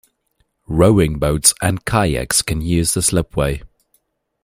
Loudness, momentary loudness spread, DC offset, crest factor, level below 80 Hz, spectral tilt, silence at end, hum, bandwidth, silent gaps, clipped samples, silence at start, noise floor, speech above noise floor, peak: -16 LUFS; 8 LU; under 0.1%; 18 dB; -32 dBFS; -4 dB/octave; 0.75 s; none; 16 kHz; none; under 0.1%; 0.7 s; -65 dBFS; 49 dB; 0 dBFS